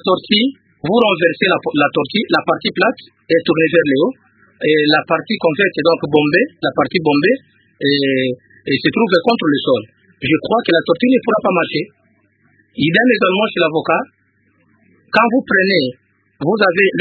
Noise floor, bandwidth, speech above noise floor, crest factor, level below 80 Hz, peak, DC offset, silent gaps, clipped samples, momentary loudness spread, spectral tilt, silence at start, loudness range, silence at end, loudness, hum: -58 dBFS; 4.8 kHz; 44 dB; 16 dB; -58 dBFS; 0 dBFS; under 0.1%; none; under 0.1%; 7 LU; -8 dB/octave; 0.05 s; 2 LU; 0 s; -15 LUFS; none